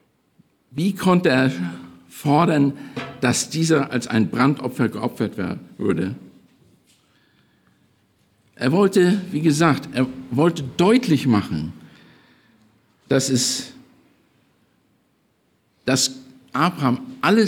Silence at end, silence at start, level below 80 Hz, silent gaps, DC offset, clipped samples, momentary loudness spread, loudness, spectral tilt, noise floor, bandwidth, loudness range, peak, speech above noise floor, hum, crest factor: 0 s; 0.75 s; -62 dBFS; none; under 0.1%; under 0.1%; 12 LU; -20 LUFS; -5 dB/octave; -65 dBFS; 18 kHz; 8 LU; -4 dBFS; 45 dB; none; 18 dB